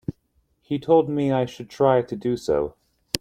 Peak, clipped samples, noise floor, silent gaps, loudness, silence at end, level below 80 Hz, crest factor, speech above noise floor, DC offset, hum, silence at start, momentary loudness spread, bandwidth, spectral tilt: 0 dBFS; under 0.1%; -67 dBFS; none; -23 LUFS; 0.05 s; -52 dBFS; 24 dB; 45 dB; under 0.1%; none; 0.1 s; 11 LU; 15.5 kHz; -6 dB/octave